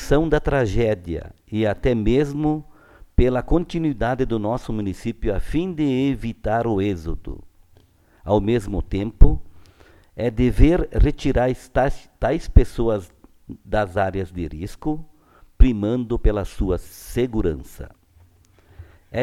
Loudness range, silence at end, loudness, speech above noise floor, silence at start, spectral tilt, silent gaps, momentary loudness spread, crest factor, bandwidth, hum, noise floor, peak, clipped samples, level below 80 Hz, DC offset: 4 LU; 0 s; -22 LUFS; 35 dB; 0 s; -7.5 dB/octave; none; 12 LU; 20 dB; 13.5 kHz; none; -54 dBFS; 0 dBFS; under 0.1%; -24 dBFS; under 0.1%